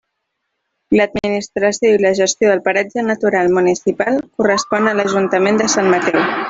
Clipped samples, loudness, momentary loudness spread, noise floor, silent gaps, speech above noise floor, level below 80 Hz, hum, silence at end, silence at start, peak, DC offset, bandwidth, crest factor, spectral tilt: under 0.1%; -15 LUFS; 4 LU; -73 dBFS; none; 59 dB; -52 dBFS; none; 0 s; 0.9 s; -2 dBFS; under 0.1%; 8 kHz; 14 dB; -4 dB/octave